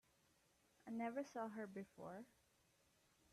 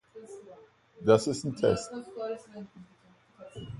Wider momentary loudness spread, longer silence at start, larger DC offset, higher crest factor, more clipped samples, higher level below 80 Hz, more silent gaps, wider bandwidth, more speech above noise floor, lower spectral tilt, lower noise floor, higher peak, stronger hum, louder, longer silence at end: second, 14 LU vs 24 LU; first, 0.85 s vs 0.15 s; neither; second, 18 dB vs 24 dB; neither; second, -88 dBFS vs -60 dBFS; neither; first, 13.5 kHz vs 11.5 kHz; about the same, 29 dB vs 29 dB; about the same, -6 dB/octave vs -5.5 dB/octave; first, -79 dBFS vs -59 dBFS; second, -36 dBFS vs -8 dBFS; neither; second, -51 LUFS vs -29 LUFS; first, 1 s vs 0 s